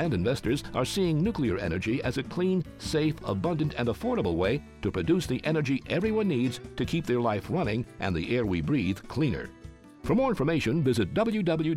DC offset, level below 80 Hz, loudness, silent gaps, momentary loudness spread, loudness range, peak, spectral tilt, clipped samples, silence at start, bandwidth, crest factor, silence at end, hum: under 0.1%; -48 dBFS; -28 LUFS; none; 5 LU; 1 LU; -14 dBFS; -6.5 dB/octave; under 0.1%; 0 s; 15.5 kHz; 14 dB; 0 s; none